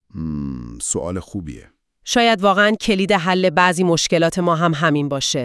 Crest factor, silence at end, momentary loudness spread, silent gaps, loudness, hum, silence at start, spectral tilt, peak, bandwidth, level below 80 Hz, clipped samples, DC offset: 18 dB; 0 s; 14 LU; none; -17 LUFS; none; 0.15 s; -4 dB/octave; 0 dBFS; 12 kHz; -46 dBFS; under 0.1%; under 0.1%